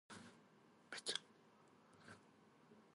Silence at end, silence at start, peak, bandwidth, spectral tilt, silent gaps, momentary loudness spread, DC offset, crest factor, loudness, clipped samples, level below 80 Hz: 0 s; 0.1 s; -26 dBFS; 11.5 kHz; -1 dB/octave; none; 23 LU; under 0.1%; 32 dB; -49 LUFS; under 0.1%; under -90 dBFS